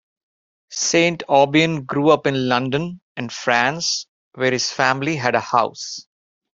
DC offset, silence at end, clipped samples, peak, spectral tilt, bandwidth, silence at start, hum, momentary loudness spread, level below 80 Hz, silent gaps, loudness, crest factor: under 0.1%; 0.55 s; under 0.1%; 0 dBFS; -3.5 dB/octave; 7.8 kHz; 0.7 s; none; 13 LU; -60 dBFS; 3.02-3.15 s, 4.08-4.31 s; -19 LUFS; 20 dB